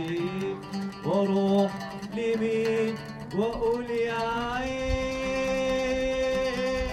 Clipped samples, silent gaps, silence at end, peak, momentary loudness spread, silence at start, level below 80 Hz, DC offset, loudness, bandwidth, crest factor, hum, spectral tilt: under 0.1%; none; 0 s; -14 dBFS; 8 LU; 0 s; -44 dBFS; under 0.1%; -28 LUFS; 14 kHz; 14 dB; none; -6 dB/octave